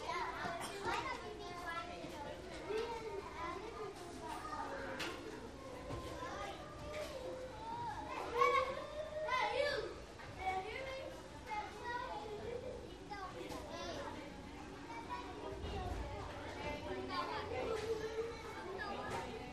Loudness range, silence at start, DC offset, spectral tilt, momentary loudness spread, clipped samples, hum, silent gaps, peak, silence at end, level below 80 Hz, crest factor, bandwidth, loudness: 8 LU; 0 s; under 0.1%; -4.5 dB/octave; 10 LU; under 0.1%; none; none; -20 dBFS; 0 s; -58 dBFS; 24 dB; 13 kHz; -43 LUFS